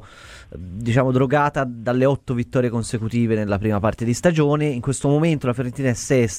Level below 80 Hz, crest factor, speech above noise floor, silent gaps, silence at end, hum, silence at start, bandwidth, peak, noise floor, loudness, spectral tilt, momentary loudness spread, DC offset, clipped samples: -46 dBFS; 18 dB; 23 dB; none; 0 s; none; 0 s; 15 kHz; -2 dBFS; -42 dBFS; -20 LUFS; -6.5 dB/octave; 6 LU; under 0.1%; under 0.1%